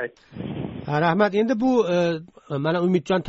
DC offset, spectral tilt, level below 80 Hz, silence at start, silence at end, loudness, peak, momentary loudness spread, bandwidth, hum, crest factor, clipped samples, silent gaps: under 0.1%; -5.5 dB/octave; -56 dBFS; 0 s; 0 s; -22 LUFS; -6 dBFS; 13 LU; 8 kHz; none; 16 dB; under 0.1%; none